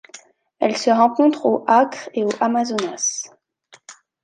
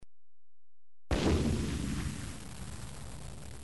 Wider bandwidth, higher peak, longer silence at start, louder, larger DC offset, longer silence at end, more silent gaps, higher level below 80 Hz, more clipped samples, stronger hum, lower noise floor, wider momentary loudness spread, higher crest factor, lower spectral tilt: about the same, 10.5 kHz vs 11.5 kHz; first, -2 dBFS vs -18 dBFS; first, 0.15 s vs 0 s; first, -19 LUFS vs -35 LUFS; second, under 0.1% vs 0.5%; first, 0.3 s vs 0 s; neither; second, -74 dBFS vs -42 dBFS; neither; neither; second, -53 dBFS vs under -90 dBFS; second, 8 LU vs 16 LU; about the same, 18 dB vs 20 dB; second, -3 dB/octave vs -5.5 dB/octave